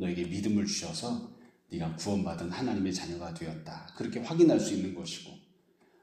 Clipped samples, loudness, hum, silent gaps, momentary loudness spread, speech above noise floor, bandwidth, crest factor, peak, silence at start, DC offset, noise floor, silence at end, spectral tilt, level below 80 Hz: under 0.1%; -32 LUFS; none; none; 17 LU; 34 dB; 13 kHz; 20 dB; -12 dBFS; 0 s; under 0.1%; -66 dBFS; 0.65 s; -5.5 dB/octave; -62 dBFS